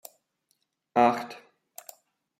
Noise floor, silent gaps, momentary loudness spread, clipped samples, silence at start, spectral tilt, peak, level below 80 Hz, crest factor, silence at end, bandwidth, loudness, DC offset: -75 dBFS; none; 25 LU; under 0.1%; 0.95 s; -5 dB/octave; -8 dBFS; -80 dBFS; 22 dB; 1.05 s; 16 kHz; -25 LUFS; under 0.1%